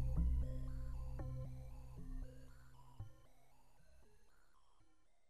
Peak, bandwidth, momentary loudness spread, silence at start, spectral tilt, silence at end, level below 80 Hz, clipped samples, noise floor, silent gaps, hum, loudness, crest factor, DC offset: -26 dBFS; 10.5 kHz; 21 LU; 0 s; -8.5 dB/octave; 0 s; -46 dBFS; under 0.1%; -76 dBFS; none; none; -48 LUFS; 18 dB; 0.1%